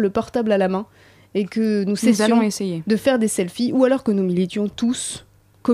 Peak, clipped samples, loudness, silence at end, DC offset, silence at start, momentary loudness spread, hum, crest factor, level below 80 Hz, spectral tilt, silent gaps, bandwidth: -4 dBFS; under 0.1%; -20 LUFS; 0 s; under 0.1%; 0 s; 10 LU; none; 16 dB; -56 dBFS; -5.5 dB/octave; none; 15 kHz